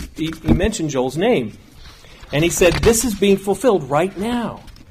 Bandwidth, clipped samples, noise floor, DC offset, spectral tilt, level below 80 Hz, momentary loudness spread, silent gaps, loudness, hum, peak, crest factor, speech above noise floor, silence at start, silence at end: 15.5 kHz; under 0.1%; -41 dBFS; under 0.1%; -4.5 dB/octave; -32 dBFS; 10 LU; none; -18 LUFS; none; -4 dBFS; 14 dB; 23 dB; 0 s; 0.2 s